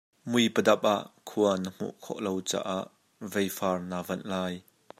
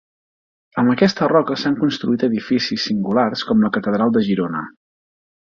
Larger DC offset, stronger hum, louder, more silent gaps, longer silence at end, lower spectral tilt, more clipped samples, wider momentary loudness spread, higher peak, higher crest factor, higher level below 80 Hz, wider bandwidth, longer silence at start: neither; neither; second, -29 LUFS vs -18 LUFS; neither; second, 0.4 s vs 0.8 s; second, -4.5 dB/octave vs -6.5 dB/octave; neither; first, 13 LU vs 5 LU; second, -8 dBFS vs -2 dBFS; about the same, 22 dB vs 18 dB; second, -76 dBFS vs -58 dBFS; first, 16 kHz vs 7.2 kHz; second, 0.25 s vs 0.75 s